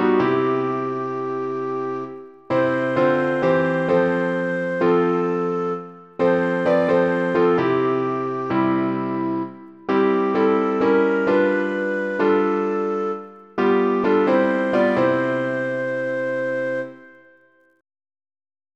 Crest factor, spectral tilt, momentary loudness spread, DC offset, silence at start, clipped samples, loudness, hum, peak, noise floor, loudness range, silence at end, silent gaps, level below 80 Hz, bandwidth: 14 dB; -8 dB/octave; 8 LU; under 0.1%; 0 s; under 0.1%; -20 LUFS; none; -6 dBFS; -56 dBFS; 3 LU; 1.7 s; none; -62 dBFS; 8 kHz